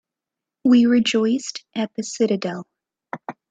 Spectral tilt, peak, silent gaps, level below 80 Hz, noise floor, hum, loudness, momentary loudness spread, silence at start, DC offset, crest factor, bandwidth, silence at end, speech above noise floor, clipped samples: -4.5 dB/octave; -6 dBFS; none; -66 dBFS; -86 dBFS; none; -20 LUFS; 19 LU; 0.65 s; under 0.1%; 16 dB; 8.4 kHz; 0.2 s; 67 dB; under 0.1%